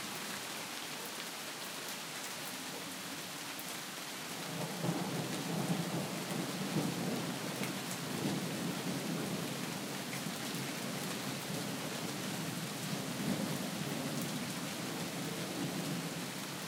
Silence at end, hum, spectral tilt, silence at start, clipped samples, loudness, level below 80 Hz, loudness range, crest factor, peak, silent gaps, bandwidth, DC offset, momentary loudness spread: 0 s; none; -3.5 dB/octave; 0 s; under 0.1%; -39 LUFS; -78 dBFS; 4 LU; 18 dB; -22 dBFS; none; 16.5 kHz; under 0.1%; 5 LU